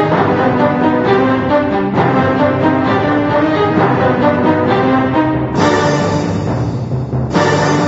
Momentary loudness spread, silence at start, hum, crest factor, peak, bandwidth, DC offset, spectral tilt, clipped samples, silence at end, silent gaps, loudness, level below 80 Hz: 5 LU; 0 s; none; 12 dB; 0 dBFS; 8 kHz; under 0.1%; -7 dB/octave; under 0.1%; 0 s; none; -13 LUFS; -38 dBFS